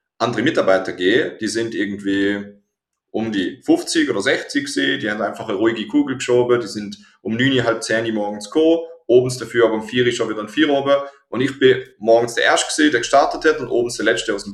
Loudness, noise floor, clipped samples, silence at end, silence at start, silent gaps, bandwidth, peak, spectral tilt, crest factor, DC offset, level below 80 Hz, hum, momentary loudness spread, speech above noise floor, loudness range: -18 LUFS; -76 dBFS; under 0.1%; 0 s; 0.2 s; none; 13 kHz; -2 dBFS; -4 dB/octave; 16 dB; under 0.1%; -56 dBFS; none; 7 LU; 58 dB; 4 LU